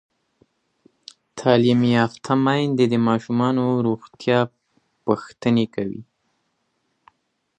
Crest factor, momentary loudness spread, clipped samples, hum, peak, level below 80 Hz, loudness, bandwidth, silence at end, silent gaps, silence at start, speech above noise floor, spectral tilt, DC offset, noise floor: 20 dB; 11 LU; under 0.1%; none; -2 dBFS; -62 dBFS; -21 LUFS; 9.2 kHz; 1.55 s; none; 1.35 s; 52 dB; -7 dB/octave; under 0.1%; -71 dBFS